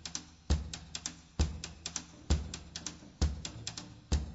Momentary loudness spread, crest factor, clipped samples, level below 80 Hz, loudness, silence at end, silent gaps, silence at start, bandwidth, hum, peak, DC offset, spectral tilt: 7 LU; 20 dB; under 0.1%; -40 dBFS; -39 LUFS; 0 s; none; 0 s; 8 kHz; none; -16 dBFS; under 0.1%; -4 dB/octave